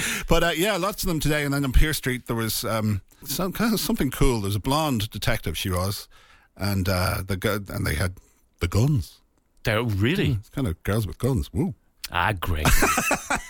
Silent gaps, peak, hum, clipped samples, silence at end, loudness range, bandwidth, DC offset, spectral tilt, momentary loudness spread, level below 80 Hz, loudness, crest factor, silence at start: none; -8 dBFS; none; under 0.1%; 0 s; 2 LU; 17.5 kHz; under 0.1%; -4.5 dB/octave; 7 LU; -32 dBFS; -25 LUFS; 16 dB; 0 s